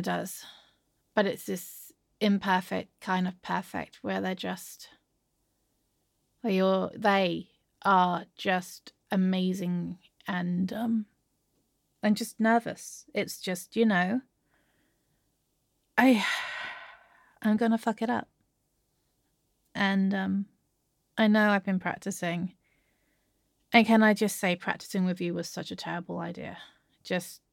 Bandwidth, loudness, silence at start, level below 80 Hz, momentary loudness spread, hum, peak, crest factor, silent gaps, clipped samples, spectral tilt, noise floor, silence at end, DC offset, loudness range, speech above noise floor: 17 kHz; -29 LUFS; 0 s; -74 dBFS; 16 LU; none; -8 dBFS; 22 dB; none; under 0.1%; -5.5 dB/octave; -76 dBFS; 0.15 s; under 0.1%; 6 LU; 48 dB